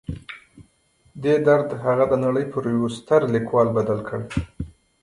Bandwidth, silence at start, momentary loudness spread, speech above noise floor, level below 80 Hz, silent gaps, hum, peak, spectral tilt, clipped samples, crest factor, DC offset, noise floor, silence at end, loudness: 11 kHz; 0.1 s; 17 LU; 40 dB; -44 dBFS; none; none; -4 dBFS; -7.5 dB/octave; under 0.1%; 18 dB; under 0.1%; -61 dBFS; 0.35 s; -21 LUFS